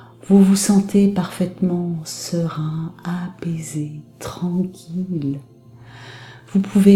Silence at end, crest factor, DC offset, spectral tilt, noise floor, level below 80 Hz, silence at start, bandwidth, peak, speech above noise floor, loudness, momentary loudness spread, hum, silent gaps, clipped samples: 0 s; 20 dB; under 0.1%; -6.5 dB/octave; -42 dBFS; -56 dBFS; 0 s; 15 kHz; 0 dBFS; 24 dB; -20 LUFS; 19 LU; none; none; under 0.1%